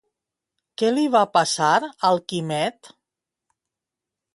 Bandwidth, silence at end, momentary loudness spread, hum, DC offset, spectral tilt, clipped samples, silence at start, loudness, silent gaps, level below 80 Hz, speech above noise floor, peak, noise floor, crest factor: 11.5 kHz; 1.45 s; 8 LU; none; under 0.1%; -4 dB/octave; under 0.1%; 0.8 s; -21 LUFS; none; -70 dBFS; 66 dB; -4 dBFS; -86 dBFS; 20 dB